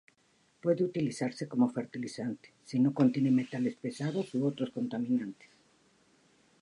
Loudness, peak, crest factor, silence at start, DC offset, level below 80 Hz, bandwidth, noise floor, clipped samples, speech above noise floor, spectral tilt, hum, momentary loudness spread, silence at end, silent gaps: -32 LUFS; -14 dBFS; 18 dB; 0.65 s; under 0.1%; -78 dBFS; 11 kHz; -69 dBFS; under 0.1%; 38 dB; -7 dB/octave; none; 11 LU; 1.3 s; none